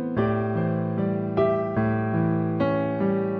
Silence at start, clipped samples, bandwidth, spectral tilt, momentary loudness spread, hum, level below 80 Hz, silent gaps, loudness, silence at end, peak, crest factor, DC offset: 0 s; under 0.1%; 4.9 kHz; -11 dB/octave; 3 LU; none; -52 dBFS; none; -25 LUFS; 0 s; -12 dBFS; 12 dB; under 0.1%